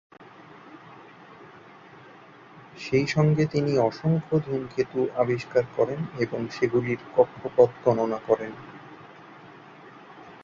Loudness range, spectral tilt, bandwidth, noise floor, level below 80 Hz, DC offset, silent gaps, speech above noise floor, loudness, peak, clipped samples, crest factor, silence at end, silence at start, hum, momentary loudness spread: 3 LU; -7.5 dB/octave; 7.6 kHz; -49 dBFS; -62 dBFS; under 0.1%; none; 25 dB; -25 LUFS; -4 dBFS; under 0.1%; 22 dB; 0.1 s; 0.65 s; none; 25 LU